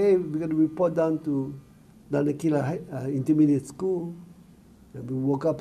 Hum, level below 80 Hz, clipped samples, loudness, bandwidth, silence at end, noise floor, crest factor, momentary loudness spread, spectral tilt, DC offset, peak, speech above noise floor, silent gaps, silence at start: none; -62 dBFS; under 0.1%; -26 LUFS; 12 kHz; 0 s; -52 dBFS; 14 dB; 15 LU; -8.5 dB/octave; under 0.1%; -12 dBFS; 28 dB; none; 0 s